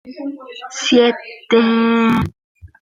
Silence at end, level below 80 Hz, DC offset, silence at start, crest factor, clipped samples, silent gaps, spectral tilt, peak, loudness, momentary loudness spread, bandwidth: 0.2 s; -48 dBFS; under 0.1%; 0.05 s; 16 dB; under 0.1%; 2.44-2.55 s; -5 dB/octave; -2 dBFS; -15 LUFS; 16 LU; 7.8 kHz